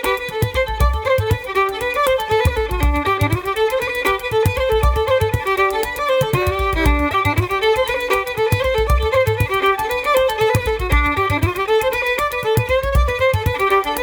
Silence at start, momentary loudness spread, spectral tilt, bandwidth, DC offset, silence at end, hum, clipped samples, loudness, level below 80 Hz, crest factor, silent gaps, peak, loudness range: 0 s; 3 LU; -5.5 dB/octave; over 20 kHz; under 0.1%; 0 s; none; under 0.1%; -18 LUFS; -26 dBFS; 14 dB; none; -4 dBFS; 1 LU